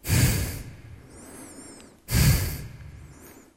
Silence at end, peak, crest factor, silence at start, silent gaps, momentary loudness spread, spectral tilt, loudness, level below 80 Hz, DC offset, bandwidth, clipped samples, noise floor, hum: 0.25 s; -10 dBFS; 18 dB; 0.05 s; none; 24 LU; -4.5 dB/octave; -24 LUFS; -34 dBFS; under 0.1%; 16 kHz; under 0.1%; -49 dBFS; none